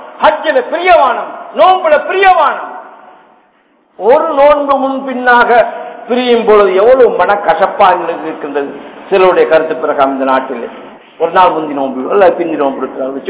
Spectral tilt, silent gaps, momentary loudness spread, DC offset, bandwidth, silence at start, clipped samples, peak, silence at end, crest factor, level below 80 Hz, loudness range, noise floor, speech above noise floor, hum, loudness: -8 dB/octave; none; 11 LU; under 0.1%; 4 kHz; 0 s; 3%; 0 dBFS; 0 s; 10 dB; -48 dBFS; 3 LU; -51 dBFS; 42 dB; none; -10 LUFS